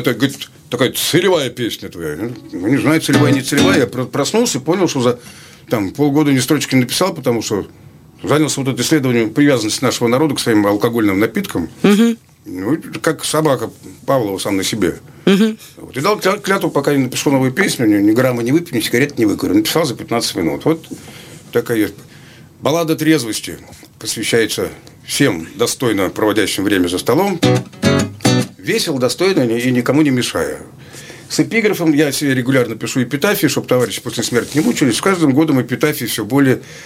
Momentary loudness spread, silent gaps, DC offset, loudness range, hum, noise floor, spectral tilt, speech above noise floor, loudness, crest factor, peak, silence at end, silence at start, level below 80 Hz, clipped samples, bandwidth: 9 LU; none; under 0.1%; 3 LU; none; -40 dBFS; -4.5 dB/octave; 25 dB; -15 LUFS; 16 dB; 0 dBFS; 0 s; 0 s; -52 dBFS; under 0.1%; 16.5 kHz